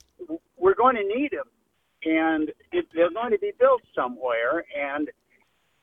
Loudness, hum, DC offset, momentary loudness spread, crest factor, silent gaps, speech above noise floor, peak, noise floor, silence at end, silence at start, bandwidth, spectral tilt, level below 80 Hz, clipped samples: -24 LUFS; none; under 0.1%; 14 LU; 18 dB; none; 42 dB; -8 dBFS; -66 dBFS; 0.7 s; 0.2 s; 3.8 kHz; -7.5 dB/octave; -64 dBFS; under 0.1%